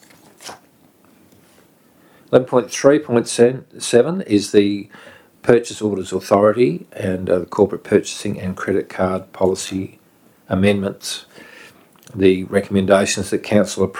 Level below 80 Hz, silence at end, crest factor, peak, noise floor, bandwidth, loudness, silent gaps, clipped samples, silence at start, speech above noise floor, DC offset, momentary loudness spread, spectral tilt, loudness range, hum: -56 dBFS; 0 s; 18 dB; 0 dBFS; -53 dBFS; 16.5 kHz; -18 LUFS; none; under 0.1%; 0.4 s; 36 dB; under 0.1%; 12 LU; -5.5 dB/octave; 5 LU; none